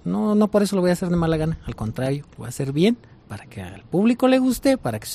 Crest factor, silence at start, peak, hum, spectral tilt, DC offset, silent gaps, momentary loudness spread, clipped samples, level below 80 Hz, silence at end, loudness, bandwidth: 14 dB; 0.05 s; -6 dBFS; none; -6.5 dB/octave; under 0.1%; none; 17 LU; under 0.1%; -44 dBFS; 0 s; -21 LUFS; 15 kHz